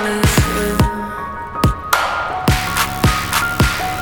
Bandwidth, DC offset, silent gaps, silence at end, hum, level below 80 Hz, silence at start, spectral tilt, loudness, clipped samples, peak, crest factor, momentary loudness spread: 19.5 kHz; under 0.1%; none; 0 s; none; -26 dBFS; 0 s; -4.5 dB/octave; -17 LUFS; under 0.1%; 0 dBFS; 16 dB; 6 LU